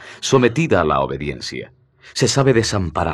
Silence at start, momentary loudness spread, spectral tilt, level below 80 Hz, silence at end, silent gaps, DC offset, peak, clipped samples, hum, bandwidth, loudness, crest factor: 0 s; 13 LU; -5 dB/octave; -42 dBFS; 0 s; none; under 0.1%; 0 dBFS; under 0.1%; none; 13 kHz; -17 LUFS; 18 dB